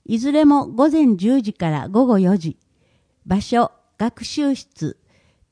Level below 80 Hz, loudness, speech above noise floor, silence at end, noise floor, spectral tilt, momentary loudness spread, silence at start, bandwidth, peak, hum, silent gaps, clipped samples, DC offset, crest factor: -52 dBFS; -18 LUFS; 44 dB; 0.6 s; -62 dBFS; -7 dB/octave; 11 LU; 0.1 s; 10.5 kHz; -2 dBFS; none; none; under 0.1%; under 0.1%; 16 dB